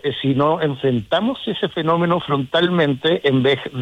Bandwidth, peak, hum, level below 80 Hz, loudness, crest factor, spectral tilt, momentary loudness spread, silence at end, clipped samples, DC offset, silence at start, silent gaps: 11.5 kHz; -4 dBFS; none; -56 dBFS; -18 LUFS; 14 dB; -7.5 dB/octave; 5 LU; 0 s; under 0.1%; under 0.1%; 0.05 s; none